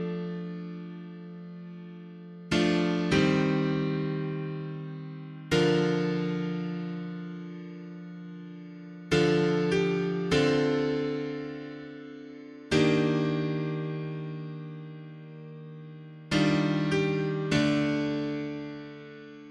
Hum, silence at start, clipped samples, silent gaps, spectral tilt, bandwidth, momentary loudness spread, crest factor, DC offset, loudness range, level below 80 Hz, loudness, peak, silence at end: none; 0 s; under 0.1%; none; -6.5 dB/octave; 11.5 kHz; 19 LU; 18 dB; under 0.1%; 5 LU; -58 dBFS; -28 LUFS; -12 dBFS; 0 s